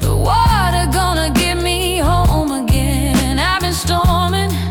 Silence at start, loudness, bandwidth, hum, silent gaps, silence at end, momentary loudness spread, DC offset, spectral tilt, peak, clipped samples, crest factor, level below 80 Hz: 0 s; -15 LUFS; 18 kHz; none; none; 0 s; 3 LU; under 0.1%; -4.5 dB/octave; -4 dBFS; under 0.1%; 10 dB; -20 dBFS